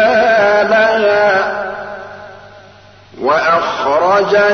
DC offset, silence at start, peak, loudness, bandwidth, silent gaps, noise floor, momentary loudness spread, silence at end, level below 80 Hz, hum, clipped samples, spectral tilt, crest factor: 0.2%; 0 s; -2 dBFS; -12 LUFS; 6.6 kHz; none; -41 dBFS; 17 LU; 0 s; -54 dBFS; 50 Hz at -45 dBFS; under 0.1%; -4.5 dB/octave; 10 dB